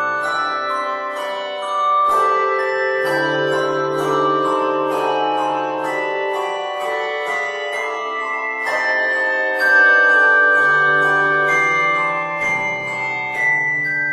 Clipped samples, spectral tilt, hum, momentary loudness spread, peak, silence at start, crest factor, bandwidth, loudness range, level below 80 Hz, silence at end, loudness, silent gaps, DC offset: under 0.1%; -3.5 dB/octave; none; 10 LU; -4 dBFS; 0 s; 14 dB; 13.5 kHz; 7 LU; -66 dBFS; 0 s; -17 LUFS; none; under 0.1%